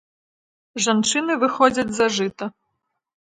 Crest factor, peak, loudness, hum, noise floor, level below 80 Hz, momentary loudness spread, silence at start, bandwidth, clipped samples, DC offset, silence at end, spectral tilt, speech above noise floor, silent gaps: 20 dB; -2 dBFS; -20 LUFS; none; -76 dBFS; -60 dBFS; 15 LU; 0.75 s; 9.6 kHz; under 0.1%; under 0.1%; 0.85 s; -3 dB/octave; 56 dB; none